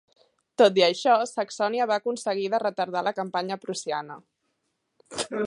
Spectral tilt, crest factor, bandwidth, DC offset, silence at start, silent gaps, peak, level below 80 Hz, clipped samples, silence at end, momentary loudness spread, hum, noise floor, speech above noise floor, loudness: -3.5 dB/octave; 20 dB; 11 kHz; under 0.1%; 0.6 s; none; -6 dBFS; -76 dBFS; under 0.1%; 0 s; 13 LU; none; -76 dBFS; 52 dB; -25 LUFS